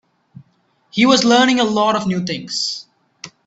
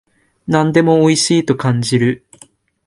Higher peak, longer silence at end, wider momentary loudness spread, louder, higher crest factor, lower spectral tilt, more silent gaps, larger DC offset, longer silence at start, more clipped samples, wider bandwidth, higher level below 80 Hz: about the same, 0 dBFS vs 0 dBFS; second, 0.2 s vs 0.7 s; first, 17 LU vs 7 LU; about the same, -16 LUFS vs -14 LUFS; about the same, 18 dB vs 14 dB; about the same, -4 dB/octave vs -5 dB/octave; neither; neither; first, 0.95 s vs 0.5 s; neither; second, 8.2 kHz vs 11.5 kHz; second, -60 dBFS vs -52 dBFS